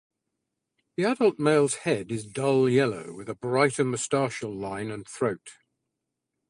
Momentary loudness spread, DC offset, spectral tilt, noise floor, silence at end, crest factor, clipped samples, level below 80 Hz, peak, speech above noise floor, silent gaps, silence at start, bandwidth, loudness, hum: 13 LU; under 0.1%; -5 dB/octave; -83 dBFS; 0.95 s; 20 dB; under 0.1%; -66 dBFS; -6 dBFS; 58 dB; none; 1 s; 11.5 kHz; -26 LUFS; none